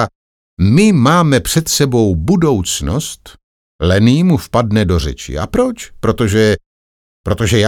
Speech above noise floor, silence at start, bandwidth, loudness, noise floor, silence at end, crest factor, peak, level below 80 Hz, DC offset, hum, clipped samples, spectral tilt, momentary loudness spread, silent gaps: over 78 dB; 0 s; 18.5 kHz; -13 LUFS; under -90 dBFS; 0 s; 12 dB; 0 dBFS; -30 dBFS; under 0.1%; none; under 0.1%; -5.5 dB/octave; 11 LU; 0.15-0.57 s, 3.43-3.79 s, 6.66-7.24 s